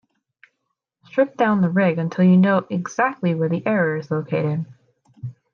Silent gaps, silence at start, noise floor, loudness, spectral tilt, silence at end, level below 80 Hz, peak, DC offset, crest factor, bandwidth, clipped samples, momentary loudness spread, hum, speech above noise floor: none; 1.15 s; -77 dBFS; -20 LUFS; -8 dB/octave; 0.2 s; -68 dBFS; -6 dBFS; under 0.1%; 16 dB; 6.6 kHz; under 0.1%; 12 LU; none; 58 dB